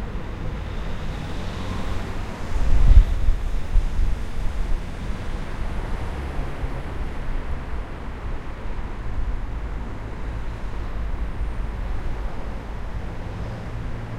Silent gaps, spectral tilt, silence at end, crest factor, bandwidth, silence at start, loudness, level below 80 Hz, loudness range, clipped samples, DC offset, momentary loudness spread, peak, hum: none; -7 dB/octave; 0 s; 22 dB; 8.8 kHz; 0 s; -29 LUFS; -24 dBFS; 8 LU; under 0.1%; under 0.1%; 8 LU; 0 dBFS; none